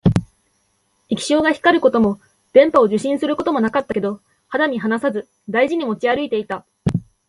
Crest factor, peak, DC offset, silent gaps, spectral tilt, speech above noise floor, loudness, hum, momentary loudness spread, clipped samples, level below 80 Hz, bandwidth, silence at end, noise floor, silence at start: 18 dB; 0 dBFS; under 0.1%; none; -6 dB/octave; 47 dB; -18 LUFS; none; 11 LU; under 0.1%; -44 dBFS; 11.5 kHz; 0.25 s; -65 dBFS; 0.05 s